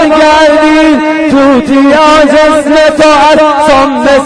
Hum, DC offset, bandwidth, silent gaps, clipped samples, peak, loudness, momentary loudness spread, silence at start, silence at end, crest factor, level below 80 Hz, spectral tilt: none; under 0.1%; 10.5 kHz; none; 1%; 0 dBFS; -4 LUFS; 3 LU; 0 s; 0 s; 4 dB; -32 dBFS; -4 dB/octave